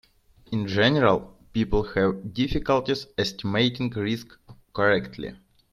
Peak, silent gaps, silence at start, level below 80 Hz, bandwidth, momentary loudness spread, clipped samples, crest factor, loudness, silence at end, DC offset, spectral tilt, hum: -6 dBFS; none; 0.5 s; -42 dBFS; 14 kHz; 11 LU; under 0.1%; 20 dB; -25 LUFS; 0.4 s; under 0.1%; -6 dB/octave; none